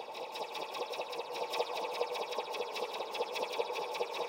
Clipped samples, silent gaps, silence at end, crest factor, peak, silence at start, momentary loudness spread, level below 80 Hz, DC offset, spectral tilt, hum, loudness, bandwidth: under 0.1%; none; 0 s; 18 dB; -20 dBFS; 0 s; 4 LU; under -90 dBFS; under 0.1%; -1 dB/octave; none; -38 LUFS; 16 kHz